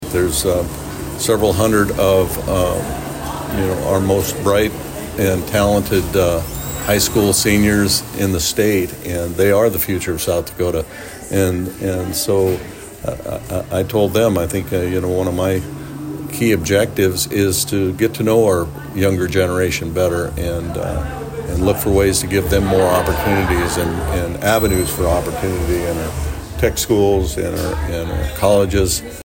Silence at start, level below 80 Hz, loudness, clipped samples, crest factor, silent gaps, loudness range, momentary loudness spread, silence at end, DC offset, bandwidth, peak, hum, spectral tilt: 0 s; -32 dBFS; -17 LUFS; under 0.1%; 14 dB; none; 3 LU; 10 LU; 0 s; under 0.1%; 16.5 kHz; -2 dBFS; none; -5 dB/octave